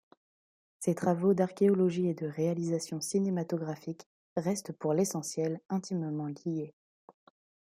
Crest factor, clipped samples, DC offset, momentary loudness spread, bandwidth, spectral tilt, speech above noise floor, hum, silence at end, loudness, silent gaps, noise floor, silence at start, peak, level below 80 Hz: 18 dB; under 0.1%; under 0.1%; 11 LU; 15.5 kHz; -6.5 dB/octave; over 59 dB; none; 1 s; -32 LUFS; 4.06-4.36 s; under -90 dBFS; 0.8 s; -14 dBFS; -76 dBFS